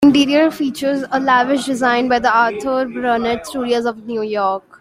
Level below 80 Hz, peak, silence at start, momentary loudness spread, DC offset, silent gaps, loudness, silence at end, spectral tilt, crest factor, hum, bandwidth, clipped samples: -52 dBFS; -2 dBFS; 0 s; 7 LU; under 0.1%; none; -17 LUFS; 0.2 s; -4 dB/octave; 14 dB; none; 15.5 kHz; under 0.1%